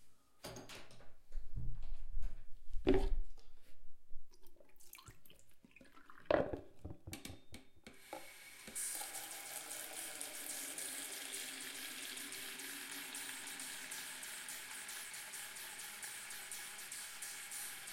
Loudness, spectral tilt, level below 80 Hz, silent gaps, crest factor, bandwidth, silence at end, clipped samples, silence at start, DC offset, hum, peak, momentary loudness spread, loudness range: -45 LUFS; -2.5 dB/octave; -50 dBFS; none; 24 dB; 16.5 kHz; 0 s; under 0.1%; 0 s; under 0.1%; none; -16 dBFS; 19 LU; 2 LU